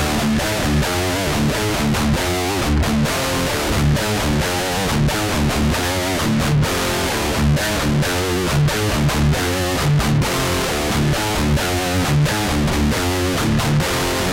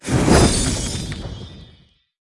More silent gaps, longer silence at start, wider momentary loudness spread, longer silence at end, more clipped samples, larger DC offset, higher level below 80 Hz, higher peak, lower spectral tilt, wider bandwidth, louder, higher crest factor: neither; about the same, 0 s vs 0.05 s; second, 2 LU vs 21 LU; second, 0 s vs 0.6 s; neither; neither; about the same, -28 dBFS vs -28 dBFS; second, -8 dBFS vs 0 dBFS; about the same, -4.5 dB/octave vs -4.5 dB/octave; first, 17 kHz vs 12 kHz; about the same, -18 LUFS vs -18 LUFS; second, 10 dB vs 20 dB